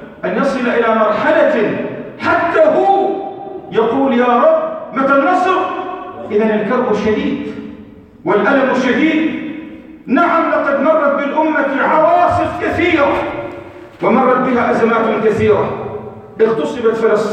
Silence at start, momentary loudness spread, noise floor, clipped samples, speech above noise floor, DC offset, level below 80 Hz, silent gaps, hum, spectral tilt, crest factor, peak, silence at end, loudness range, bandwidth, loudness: 0 s; 14 LU; -37 dBFS; under 0.1%; 24 dB; under 0.1%; -48 dBFS; none; none; -6.5 dB/octave; 14 dB; 0 dBFS; 0 s; 3 LU; 9.2 kHz; -14 LUFS